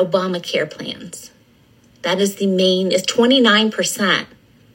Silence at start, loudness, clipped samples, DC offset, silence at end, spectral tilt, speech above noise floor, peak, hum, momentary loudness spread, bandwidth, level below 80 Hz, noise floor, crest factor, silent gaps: 0 s; -17 LUFS; under 0.1%; under 0.1%; 0.5 s; -3.5 dB/octave; 35 dB; 0 dBFS; none; 17 LU; 16.5 kHz; -64 dBFS; -52 dBFS; 18 dB; none